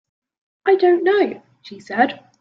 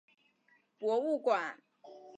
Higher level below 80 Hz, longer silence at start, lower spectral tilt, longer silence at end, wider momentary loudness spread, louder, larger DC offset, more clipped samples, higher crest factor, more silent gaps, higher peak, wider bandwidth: first, -70 dBFS vs under -90 dBFS; second, 0.65 s vs 0.8 s; first, -6 dB/octave vs -4.5 dB/octave; first, 0.25 s vs 0 s; second, 11 LU vs 21 LU; first, -18 LUFS vs -33 LUFS; neither; neither; about the same, 16 dB vs 20 dB; neither; first, -2 dBFS vs -16 dBFS; second, 6.8 kHz vs 9.2 kHz